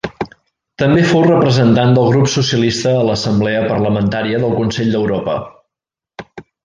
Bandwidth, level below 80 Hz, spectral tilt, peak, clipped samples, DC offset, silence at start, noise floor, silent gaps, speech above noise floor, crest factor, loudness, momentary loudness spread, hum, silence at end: 9.6 kHz; -44 dBFS; -6 dB/octave; -2 dBFS; under 0.1%; under 0.1%; 0.05 s; -86 dBFS; none; 73 dB; 12 dB; -14 LUFS; 12 LU; none; 0.25 s